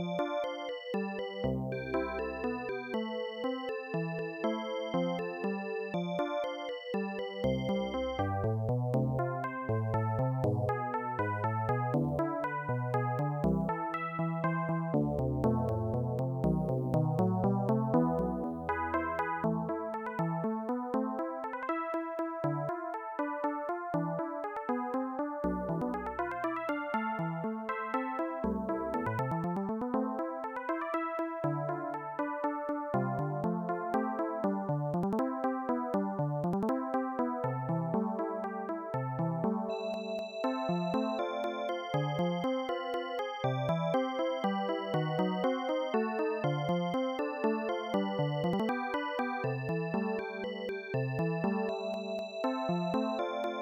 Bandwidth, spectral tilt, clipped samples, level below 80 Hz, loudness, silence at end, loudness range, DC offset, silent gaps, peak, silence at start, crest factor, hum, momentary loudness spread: 10.5 kHz; -8 dB/octave; under 0.1%; -56 dBFS; -34 LUFS; 0 s; 4 LU; under 0.1%; none; -18 dBFS; 0 s; 14 dB; none; 5 LU